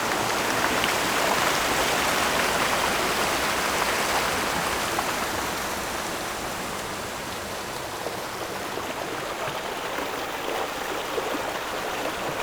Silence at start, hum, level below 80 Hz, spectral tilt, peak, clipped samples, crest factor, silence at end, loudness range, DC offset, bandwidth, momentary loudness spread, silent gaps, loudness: 0 s; none; -48 dBFS; -2 dB/octave; -6 dBFS; under 0.1%; 20 dB; 0 s; 8 LU; under 0.1%; over 20 kHz; 9 LU; none; -26 LUFS